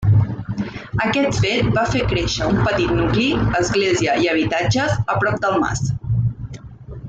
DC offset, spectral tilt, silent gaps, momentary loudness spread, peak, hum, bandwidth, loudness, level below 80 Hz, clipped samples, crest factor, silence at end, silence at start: under 0.1%; -5.5 dB/octave; none; 8 LU; -6 dBFS; none; 8 kHz; -19 LUFS; -34 dBFS; under 0.1%; 12 dB; 0 s; 0 s